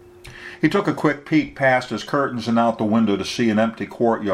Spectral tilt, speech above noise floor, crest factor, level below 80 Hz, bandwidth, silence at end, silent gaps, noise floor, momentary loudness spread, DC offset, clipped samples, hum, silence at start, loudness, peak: -6 dB/octave; 20 dB; 18 dB; -54 dBFS; 12 kHz; 0 s; none; -40 dBFS; 4 LU; under 0.1%; under 0.1%; none; 0.25 s; -20 LUFS; -2 dBFS